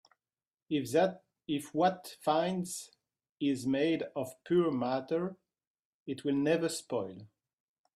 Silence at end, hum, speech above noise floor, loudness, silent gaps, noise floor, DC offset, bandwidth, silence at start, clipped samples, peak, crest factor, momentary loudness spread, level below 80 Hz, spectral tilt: 0.7 s; none; over 58 dB; -33 LUFS; 3.31-3.35 s, 5.67-6.06 s; under -90 dBFS; under 0.1%; 15 kHz; 0.7 s; under 0.1%; -16 dBFS; 18 dB; 13 LU; -76 dBFS; -5.5 dB/octave